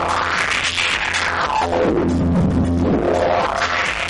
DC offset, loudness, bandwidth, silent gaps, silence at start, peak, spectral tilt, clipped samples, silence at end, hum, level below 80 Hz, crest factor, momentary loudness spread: under 0.1%; -17 LUFS; 11.5 kHz; none; 0 s; -6 dBFS; -4.5 dB/octave; under 0.1%; 0 s; none; -34 dBFS; 12 dB; 1 LU